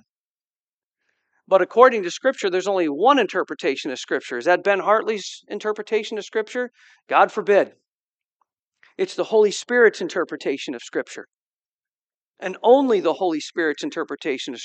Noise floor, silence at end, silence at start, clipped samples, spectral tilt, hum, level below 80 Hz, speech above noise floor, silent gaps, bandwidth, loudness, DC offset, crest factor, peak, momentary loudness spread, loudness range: under -90 dBFS; 0 s; 1.5 s; under 0.1%; -3.5 dB/octave; none; -78 dBFS; over 69 dB; 7.03-7.07 s, 7.88-8.18 s, 8.24-8.40 s, 8.59-8.72 s, 11.34-11.59 s, 11.66-11.79 s, 11.94-12.07 s, 12.14-12.34 s; 8.8 kHz; -21 LUFS; under 0.1%; 22 dB; 0 dBFS; 12 LU; 4 LU